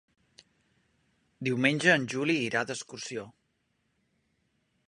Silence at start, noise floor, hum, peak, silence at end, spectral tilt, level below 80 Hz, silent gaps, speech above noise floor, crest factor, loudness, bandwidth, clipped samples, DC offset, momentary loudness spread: 1.4 s; -76 dBFS; none; -6 dBFS; 1.6 s; -4.5 dB/octave; -74 dBFS; none; 47 dB; 26 dB; -28 LUFS; 11.5 kHz; under 0.1%; under 0.1%; 14 LU